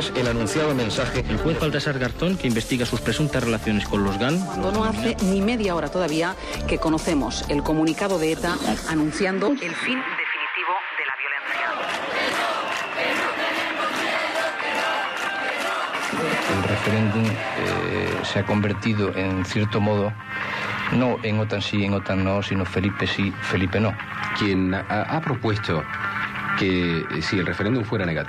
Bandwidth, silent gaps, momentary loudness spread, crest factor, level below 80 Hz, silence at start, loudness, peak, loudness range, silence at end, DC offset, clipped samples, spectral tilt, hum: 15 kHz; none; 3 LU; 12 dB; -42 dBFS; 0 s; -23 LUFS; -10 dBFS; 1 LU; 0 s; under 0.1%; under 0.1%; -5.5 dB/octave; none